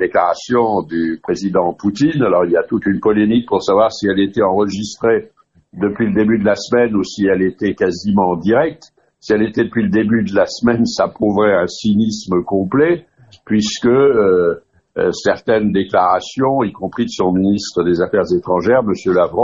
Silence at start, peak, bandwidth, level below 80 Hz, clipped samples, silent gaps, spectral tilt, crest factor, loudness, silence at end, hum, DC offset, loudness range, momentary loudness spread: 0 s; 0 dBFS; 8 kHz; -48 dBFS; under 0.1%; none; -6 dB/octave; 14 dB; -15 LUFS; 0 s; none; under 0.1%; 1 LU; 6 LU